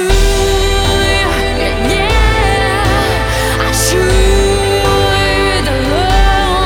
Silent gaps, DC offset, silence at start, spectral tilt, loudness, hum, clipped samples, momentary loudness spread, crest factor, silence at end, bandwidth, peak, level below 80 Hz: none; 0.5%; 0 s; -4 dB/octave; -12 LUFS; none; under 0.1%; 3 LU; 10 dB; 0 s; 17 kHz; 0 dBFS; -16 dBFS